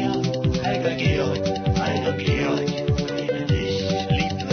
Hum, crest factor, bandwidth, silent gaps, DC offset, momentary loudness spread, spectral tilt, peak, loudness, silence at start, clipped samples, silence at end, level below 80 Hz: none; 14 dB; 6.6 kHz; none; under 0.1%; 2 LU; -6 dB/octave; -8 dBFS; -23 LUFS; 0 s; under 0.1%; 0 s; -38 dBFS